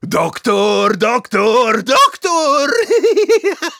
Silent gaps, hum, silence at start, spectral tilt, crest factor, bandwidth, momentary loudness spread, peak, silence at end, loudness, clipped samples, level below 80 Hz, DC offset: none; none; 0.05 s; -3.5 dB/octave; 12 dB; 17 kHz; 4 LU; -2 dBFS; 0.05 s; -13 LUFS; under 0.1%; -60 dBFS; under 0.1%